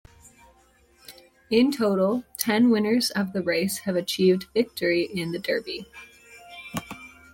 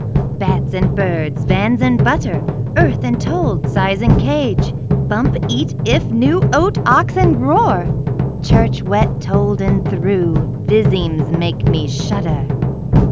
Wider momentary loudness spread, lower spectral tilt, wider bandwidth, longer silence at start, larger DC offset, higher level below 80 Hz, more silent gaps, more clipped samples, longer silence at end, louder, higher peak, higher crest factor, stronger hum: first, 18 LU vs 5 LU; second, -4.5 dB/octave vs -7.5 dB/octave; first, 17 kHz vs 7.6 kHz; first, 1.1 s vs 0 s; second, under 0.1% vs 0.9%; second, -62 dBFS vs -26 dBFS; neither; neither; first, 0.25 s vs 0 s; second, -24 LUFS vs -15 LUFS; second, -6 dBFS vs 0 dBFS; first, 20 dB vs 14 dB; neither